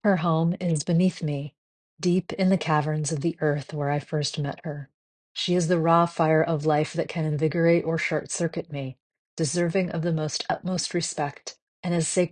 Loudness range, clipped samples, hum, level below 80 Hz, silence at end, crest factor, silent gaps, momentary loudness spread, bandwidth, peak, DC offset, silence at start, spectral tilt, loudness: 4 LU; under 0.1%; none; -64 dBFS; 0.05 s; 20 dB; 1.58-1.97 s, 4.94-5.35 s, 9.00-9.10 s, 9.19-9.37 s, 11.62-11.83 s; 12 LU; 10 kHz; -6 dBFS; under 0.1%; 0.05 s; -5.5 dB/octave; -25 LUFS